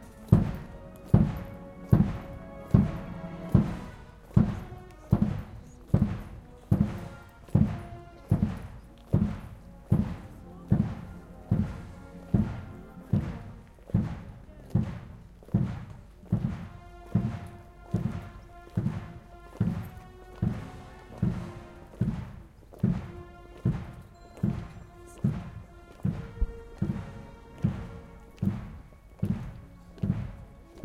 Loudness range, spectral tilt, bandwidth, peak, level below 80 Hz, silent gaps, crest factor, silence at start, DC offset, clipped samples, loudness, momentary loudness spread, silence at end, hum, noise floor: 7 LU; -9.5 dB/octave; 13 kHz; -6 dBFS; -42 dBFS; none; 26 dB; 0 s; under 0.1%; under 0.1%; -31 LUFS; 22 LU; 0 s; none; -48 dBFS